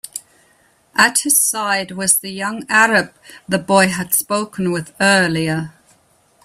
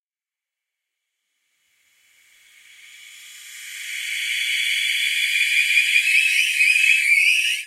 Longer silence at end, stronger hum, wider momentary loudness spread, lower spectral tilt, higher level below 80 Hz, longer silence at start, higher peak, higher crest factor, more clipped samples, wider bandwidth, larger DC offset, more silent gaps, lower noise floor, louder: first, 0.75 s vs 0 s; neither; second, 12 LU vs 16 LU; first, -2.5 dB/octave vs 8.5 dB/octave; first, -58 dBFS vs under -90 dBFS; second, 0.15 s vs 3 s; first, 0 dBFS vs -4 dBFS; about the same, 18 dB vs 18 dB; neither; about the same, 16 kHz vs 16 kHz; neither; neither; second, -56 dBFS vs under -90 dBFS; about the same, -16 LUFS vs -16 LUFS